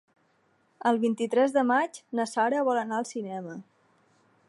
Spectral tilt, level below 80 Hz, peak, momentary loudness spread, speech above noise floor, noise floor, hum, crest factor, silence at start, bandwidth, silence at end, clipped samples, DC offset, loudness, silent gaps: -5 dB/octave; -84 dBFS; -12 dBFS; 13 LU; 41 dB; -68 dBFS; none; 16 dB; 0.85 s; 11.5 kHz; 0.85 s; under 0.1%; under 0.1%; -27 LUFS; none